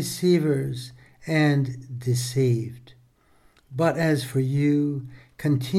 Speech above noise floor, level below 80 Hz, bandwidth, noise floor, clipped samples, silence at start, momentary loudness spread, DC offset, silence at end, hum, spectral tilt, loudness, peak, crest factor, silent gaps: 36 dB; -60 dBFS; 15.5 kHz; -59 dBFS; under 0.1%; 0 s; 15 LU; under 0.1%; 0 s; none; -6.5 dB/octave; -24 LUFS; -10 dBFS; 14 dB; none